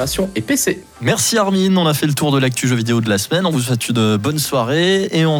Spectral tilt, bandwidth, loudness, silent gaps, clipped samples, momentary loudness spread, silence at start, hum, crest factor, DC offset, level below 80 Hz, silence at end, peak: -4.5 dB/octave; 19 kHz; -16 LUFS; none; under 0.1%; 4 LU; 0 s; none; 12 dB; under 0.1%; -46 dBFS; 0 s; -4 dBFS